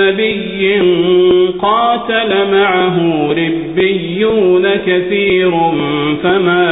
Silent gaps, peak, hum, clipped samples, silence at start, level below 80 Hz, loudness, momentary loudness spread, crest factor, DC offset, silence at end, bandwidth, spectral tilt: none; -2 dBFS; none; under 0.1%; 0 s; -44 dBFS; -12 LUFS; 4 LU; 10 dB; under 0.1%; 0 s; 4 kHz; -3.5 dB/octave